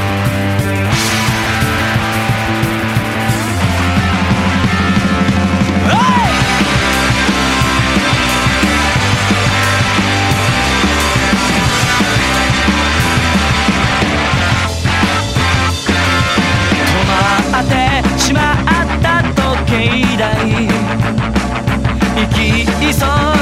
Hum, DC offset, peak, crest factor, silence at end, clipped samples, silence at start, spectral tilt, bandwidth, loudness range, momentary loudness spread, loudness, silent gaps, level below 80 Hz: none; under 0.1%; 0 dBFS; 12 dB; 0 s; under 0.1%; 0 s; -4.5 dB/octave; 16 kHz; 2 LU; 3 LU; -12 LUFS; none; -24 dBFS